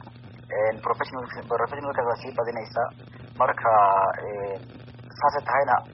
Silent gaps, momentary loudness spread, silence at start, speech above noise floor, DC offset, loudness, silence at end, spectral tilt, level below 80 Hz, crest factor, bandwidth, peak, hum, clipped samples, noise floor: none; 21 LU; 0 s; 19 dB; under 0.1%; -25 LUFS; 0 s; -4 dB/octave; -60 dBFS; 18 dB; 5.8 kHz; -8 dBFS; none; under 0.1%; -44 dBFS